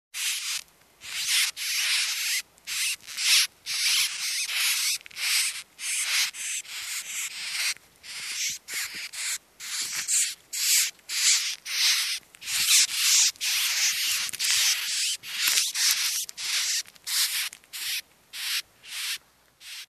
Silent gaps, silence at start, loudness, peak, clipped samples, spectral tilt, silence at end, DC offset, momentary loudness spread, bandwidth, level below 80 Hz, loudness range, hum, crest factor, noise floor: none; 0.15 s; -24 LUFS; -2 dBFS; under 0.1%; 5 dB/octave; 0.05 s; under 0.1%; 12 LU; 14 kHz; -74 dBFS; 7 LU; none; 26 dB; -54 dBFS